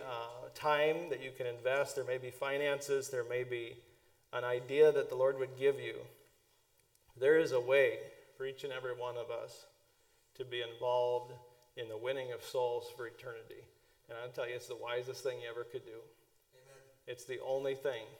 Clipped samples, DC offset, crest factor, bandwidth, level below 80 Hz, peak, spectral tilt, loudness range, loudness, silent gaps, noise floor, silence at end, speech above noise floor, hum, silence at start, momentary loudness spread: under 0.1%; under 0.1%; 22 dB; 17.5 kHz; -82 dBFS; -16 dBFS; -4 dB/octave; 10 LU; -36 LUFS; none; -72 dBFS; 0 s; 36 dB; none; 0 s; 19 LU